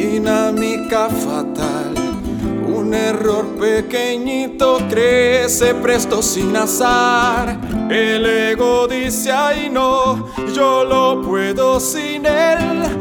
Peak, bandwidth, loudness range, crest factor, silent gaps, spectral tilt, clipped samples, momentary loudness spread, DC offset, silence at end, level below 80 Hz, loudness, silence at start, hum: 0 dBFS; over 20 kHz; 4 LU; 14 dB; none; -3.5 dB/octave; under 0.1%; 7 LU; under 0.1%; 0 s; -38 dBFS; -16 LUFS; 0 s; none